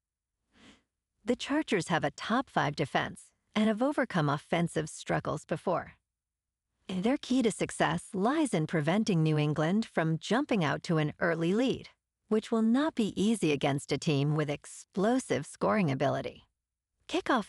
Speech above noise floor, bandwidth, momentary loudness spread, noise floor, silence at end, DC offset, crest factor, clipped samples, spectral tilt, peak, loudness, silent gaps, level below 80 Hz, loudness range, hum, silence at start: over 60 dB; 12 kHz; 7 LU; under -90 dBFS; 0 s; under 0.1%; 18 dB; under 0.1%; -6 dB/octave; -12 dBFS; -30 LUFS; none; -64 dBFS; 4 LU; none; 1.25 s